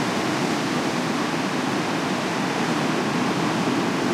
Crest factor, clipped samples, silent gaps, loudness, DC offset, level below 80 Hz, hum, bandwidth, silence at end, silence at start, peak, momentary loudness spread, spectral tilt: 12 dB; under 0.1%; none; -23 LUFS; under 0.1%; -62 dBFS; none; 16 kHz; 0 s; 0 s; -10 dBFS; 1 LU; -4.5 dB/octave